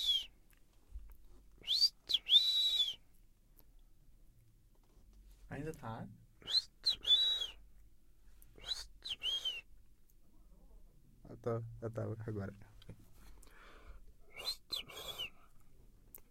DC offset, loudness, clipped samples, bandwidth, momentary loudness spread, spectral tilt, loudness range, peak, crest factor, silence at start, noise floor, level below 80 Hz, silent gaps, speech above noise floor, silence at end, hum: under 0.1%; -34 LUFS; under 0.1%; 16.5 kHz; 20 LU; -2.5 dB/octave; 14 LU; -18 dBFS; 24 dB; 0 s; -65 dBFS; -62 dBFS; none; 22 dB; 0.05 s; none